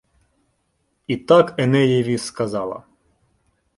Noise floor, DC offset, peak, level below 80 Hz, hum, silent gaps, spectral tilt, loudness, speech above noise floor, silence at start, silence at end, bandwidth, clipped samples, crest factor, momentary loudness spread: -69 dBFS; under 0.1%; -2 dBFS; -60 dBFS; none; none; -6.5 dB/octave; -19 LUFS; 51 dB; 1.1 s; 1 s; 11.5 kHz; under 0.1%; 18 dB; 15 LU